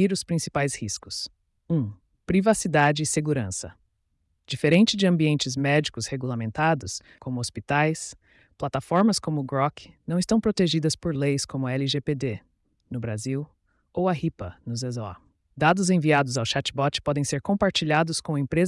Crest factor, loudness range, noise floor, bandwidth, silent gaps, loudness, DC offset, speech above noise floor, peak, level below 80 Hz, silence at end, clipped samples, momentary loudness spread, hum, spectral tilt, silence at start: 16 dB; 5 LU; -72 dBFS; 12 kHz; none; -25 LUFS; under 0.1%; 48 dB; -8 dBFS; -54 dBFS; 0 s; under 0.1%; 13 LU; none; -5 dB/octave; 0 s